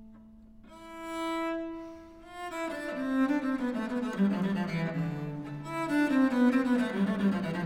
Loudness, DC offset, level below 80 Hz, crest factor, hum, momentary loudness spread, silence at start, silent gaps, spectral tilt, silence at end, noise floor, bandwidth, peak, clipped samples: -30 LUFS; under 0.1%; -60 dBFS; 16 dB; none; 17 LU; 0 s; none; -7 dB/octave; 0 s; -52 dBFS; 15.5 kHz; -14 dBFS; under 0.1%